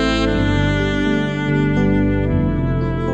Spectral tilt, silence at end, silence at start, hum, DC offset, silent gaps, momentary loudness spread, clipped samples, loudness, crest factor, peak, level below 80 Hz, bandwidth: -7 dB/octave; 0 s; 0 s; 50 Hz at -30 dBFS; under 0.1%; none; 3 LU; under 0.1%; -18 LUFS; 12 dB; -6 dBFS; -26 dBFS; 8.8 kHz